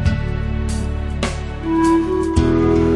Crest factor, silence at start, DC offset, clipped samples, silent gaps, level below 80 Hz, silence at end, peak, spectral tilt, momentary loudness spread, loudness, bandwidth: 14 dB; 0 s; under 0.1%; under 0.1%; none; -26 dBFS; 0 s; -4 dBFS; -7 dB/octave; 8 LU; -19 LUFS; 11.5 kHz